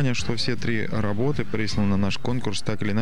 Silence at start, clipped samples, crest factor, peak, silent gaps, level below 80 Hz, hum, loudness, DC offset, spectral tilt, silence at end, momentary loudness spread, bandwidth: 0 s; under 0.1%; 16 dB; -10 dBFS; none; -46 dBFS; none; -26 LUFS; 6%; -5.5 dB/octave; 0 s; 4 LU; 11.5 kHz